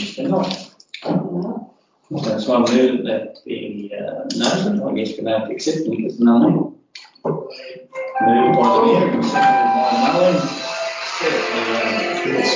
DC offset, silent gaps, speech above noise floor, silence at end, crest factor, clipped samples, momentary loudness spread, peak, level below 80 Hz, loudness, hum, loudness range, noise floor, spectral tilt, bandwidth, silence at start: under 0.1%; none; 26 dB; 0 s; 16 dB; under 0.1%; 14 LU; -4 dBFS; -62 dBFS; -18 LUFS; none; 5 LU; -43 dBFS; -5.5 dB/octave; 7.6 kHz; 0 s